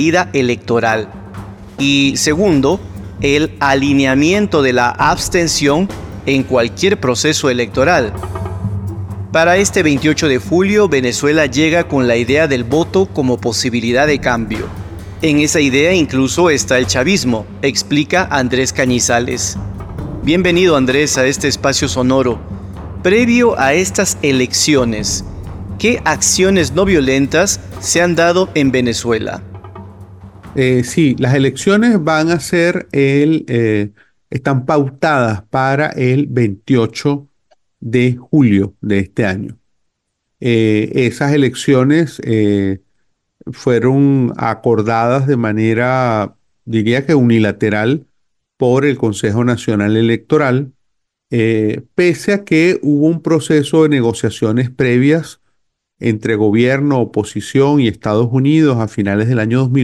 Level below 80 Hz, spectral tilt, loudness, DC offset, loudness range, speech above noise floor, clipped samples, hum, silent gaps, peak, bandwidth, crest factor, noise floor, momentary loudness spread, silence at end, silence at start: -38 dBFS; -5 dB/octave; -13 LUFS; under 0.1%; 3 LU; 58 dB; under 0.1%; none; none; 0 dBFS; 16 kHz; 12 dB; -71 dBFS; 10 LU; 0 s; 0 s